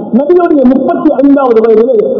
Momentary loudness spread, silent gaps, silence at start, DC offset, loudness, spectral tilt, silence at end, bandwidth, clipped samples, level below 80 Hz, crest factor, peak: 2 LU; none; 0 s; under 0.1%; -7 LUFS; -10 dB/octave; 0 s; 6 kHz; 5%; -44 dBFS; 6 dB; 0 dBFS